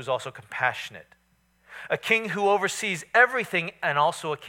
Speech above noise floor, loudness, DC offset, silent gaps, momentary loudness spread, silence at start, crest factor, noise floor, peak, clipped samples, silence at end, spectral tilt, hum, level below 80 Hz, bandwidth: 40 dB; -24 LUFS; under 0.1%; none; 14 LU; 0 s; 20 dB; -66 dBFS; -6 dBFS; under 0.1%; 0 s; -3 dB/octave; none; -72 dBFS; 17 kHz